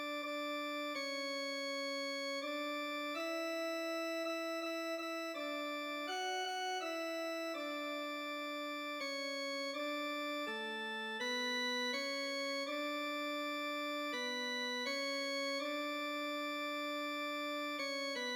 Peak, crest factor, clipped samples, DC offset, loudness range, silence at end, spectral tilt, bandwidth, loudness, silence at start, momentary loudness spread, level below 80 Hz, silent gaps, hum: -28 dBFS; 12 dB; under 0.1%; under 0.1%; 2 LU; 0 s; -0.5 dB/octave; over 20 kHz; -39 LUFS; 0 s; 3 LU; under -90 dBFS; none; none